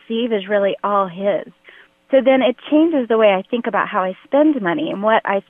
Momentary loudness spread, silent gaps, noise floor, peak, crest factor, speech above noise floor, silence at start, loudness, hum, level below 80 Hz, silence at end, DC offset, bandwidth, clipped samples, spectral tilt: 6 LU; none; -47 dBFS; -2 dBFS; 14 dB; 31 dB; 0.1 s; -17 LUFS; none; -72 dBFS; 0.1 s; under 0.1%; 3.8 kHz; under 0.1%; -8.5 dB/octave